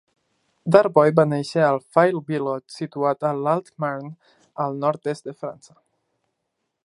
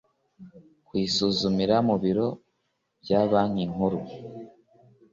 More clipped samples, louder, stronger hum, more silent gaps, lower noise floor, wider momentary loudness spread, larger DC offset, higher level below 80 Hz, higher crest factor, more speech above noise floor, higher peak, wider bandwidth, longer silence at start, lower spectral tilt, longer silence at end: neither; first, -21 LUFS vs -25 LUFS; neither; neither; about the same, -78 dBFS vs -76 dBFS; about the same, 17 LU vs 18 LU; neither; second, -70 dBFS vs -58 dBFS; about the same, 22 dB vs 18 dB; first, 56 dB vs 51 dB; first, 0 dBFS vs -8 dBFS; first, 11 kHz vs 7.6 kHz; first, 0.65 s vs 0.4 s; about the same, -7 dB/octave vs -6 dB/octave; first, 1.35 s vs 0.65 s